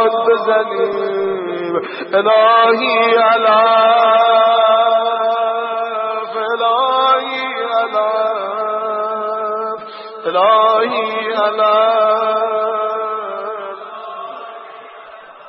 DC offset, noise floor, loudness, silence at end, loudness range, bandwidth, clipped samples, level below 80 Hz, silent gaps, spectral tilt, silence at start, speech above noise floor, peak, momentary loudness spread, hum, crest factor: under 0.1%; -36 dBFS; -14 LUFS; 0 s; 6 LU; 5.8 kHz; under 0.1%; -76 dBFS; none; -7.5 dB/octave; 0 s; 24 dB; 0 dBFS; 15 LU; none; 14 dB